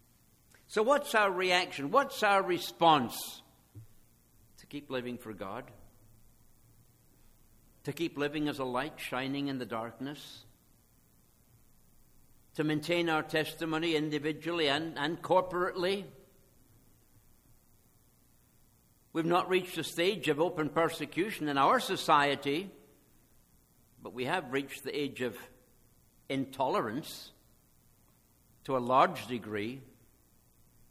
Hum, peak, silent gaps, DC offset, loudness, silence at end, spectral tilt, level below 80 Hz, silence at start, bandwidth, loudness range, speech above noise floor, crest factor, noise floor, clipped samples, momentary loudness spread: none; -10 dBFS; none; under 0.1%; -32 LUFS; 1.05 s; -4.5 dB/octave; -66 dBFS; 0.7 s; 16 kHz; 13 LU; 34 dB; 24 dB; -66 dBFS; under 0.1%; 16 LU